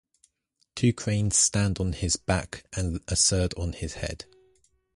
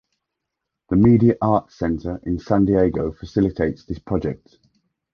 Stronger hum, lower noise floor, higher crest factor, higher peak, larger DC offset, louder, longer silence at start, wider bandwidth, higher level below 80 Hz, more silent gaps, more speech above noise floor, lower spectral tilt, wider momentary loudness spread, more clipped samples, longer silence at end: neither; second, -73 dBFS vs -81 dBFS; about the same, 18 dB vs 18 dB; second, -10 dBFS vs -4 dBFS; neither; second, -26 LUFS vs -20 LUFS; second, 0.75 s vs 0.9 s; first, 11.5 kHz vs 6.6 kHz; about the same, -40 dBFS vs -40 dBFS; neither; second, 47 dB vs 62 dB; second, -3.5 dB/octave vs -10 dB/octave; about the same, 14 LU vs 12 LU; neither; about the same, 0.7 s vs 0.8 s